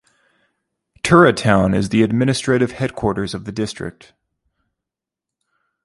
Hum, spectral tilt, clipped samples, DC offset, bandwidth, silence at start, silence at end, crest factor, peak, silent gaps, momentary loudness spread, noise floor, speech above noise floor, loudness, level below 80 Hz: none; -6 dB/octave; under 0.1%; under 0.1%; 11.5 kHz; 1.05 s; 1.95 s; 18 dB; 0 dBFS; none; 14 LU; -86 dBFS; 69 dB; -17 LUFS; -44 dBFS